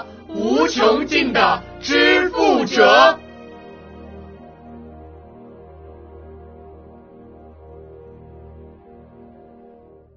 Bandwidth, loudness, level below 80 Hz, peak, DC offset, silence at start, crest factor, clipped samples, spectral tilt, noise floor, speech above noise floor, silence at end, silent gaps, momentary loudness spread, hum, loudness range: 6.6 kHz; -15 LUFS; -48 dBFS; 0 dBFS; under 0.1%; 0 s; 20 dB; under 0.1%; -1 dB/octave; -46 dBFS; 31 dB; 2.35 s; none; 27 LU; none; 8 LU